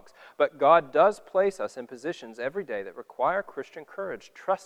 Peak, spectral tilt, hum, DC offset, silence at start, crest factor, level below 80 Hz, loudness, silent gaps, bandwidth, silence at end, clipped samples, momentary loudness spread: -6 dBFS; -5 dB/octave; none; under 0.1%; 0.4 s; 20 dB; -70 dBFS; -27 LUFS; none; 11 kHz; 0.1 s; under 0.1%; 17 LU